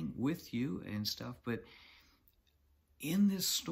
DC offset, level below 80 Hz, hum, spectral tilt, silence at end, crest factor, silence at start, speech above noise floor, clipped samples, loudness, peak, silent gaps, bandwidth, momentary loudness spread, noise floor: under 0.1%; -66 dBFS; none; -4 dB/octave; 0 s; 16 dB; 0 s; 36 dB; under 0.1%; -37 LUFS; -22 dBFS; none; 16 kHz; 12 LU; -72 dBFS